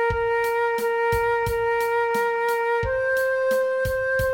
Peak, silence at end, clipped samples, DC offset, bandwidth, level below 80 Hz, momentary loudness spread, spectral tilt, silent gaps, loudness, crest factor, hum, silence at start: -12 dBFS; 0 s; under 0.1%; under 0.1%; 17 kHz; -42 dBFS; 1 LU; -4.5 dB/octave; none; -22 LUFS; 12 dB; none; 0 s